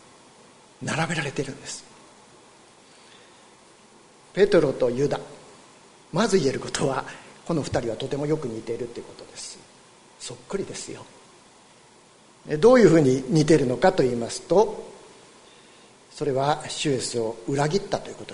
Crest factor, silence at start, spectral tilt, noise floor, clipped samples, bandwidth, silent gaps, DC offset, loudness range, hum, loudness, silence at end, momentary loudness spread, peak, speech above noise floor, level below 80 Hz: 22 dB; 0.8 s; -5.5 dB/octave; -53 dBFS; under 0.1%; 11 kHz; none; under 0.1%; 15 LU; none; -23 LUFS; 0 s; 19 LU; -4 dBFS; 30 dB; -52 dBFS